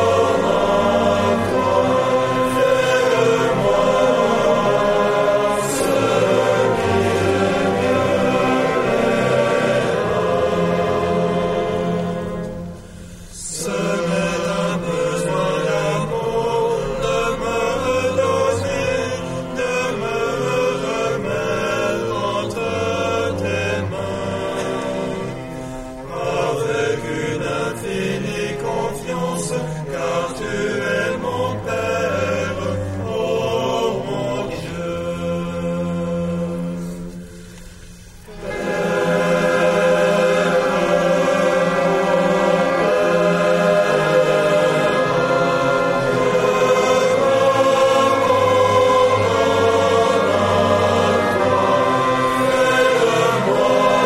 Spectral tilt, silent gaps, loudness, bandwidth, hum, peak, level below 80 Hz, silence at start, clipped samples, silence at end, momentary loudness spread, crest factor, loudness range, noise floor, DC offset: -5 dB/octave; none; -18 LUFS; 15 kHz; none; -4 dBFS; -44 dBFS; 0 s; under 0.1%; 0 s; 9 LU; 14 dB; 7 LU; -39 dBFS; under 0.1%